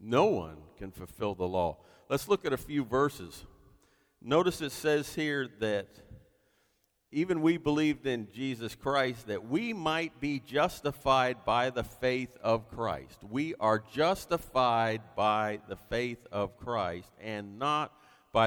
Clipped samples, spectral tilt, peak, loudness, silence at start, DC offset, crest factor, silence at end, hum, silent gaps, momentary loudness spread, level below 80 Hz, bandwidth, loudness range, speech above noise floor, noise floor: under 0.1%; -5.5 dB/octave; -12 dBFS; -31 LUFS; 0 s; under 0.1%; 20 dB; 0 s; none; none; 12 LU; -58 dBFS; over 20 kHz; 3 LU; 43 dB; -74 dBFS